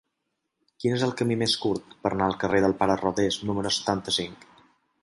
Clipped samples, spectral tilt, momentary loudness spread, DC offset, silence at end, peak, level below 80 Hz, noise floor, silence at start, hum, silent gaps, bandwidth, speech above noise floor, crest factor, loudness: under 0.1%; -4.5 dB/octave; 6 LU; under 0.1%; 0.7 s; -8 dBFS; -54 dBFS; -80 dBFS; 0.8 s; none; none; 11.5 kHz; 54 dB; 20 dB; -26 LUFS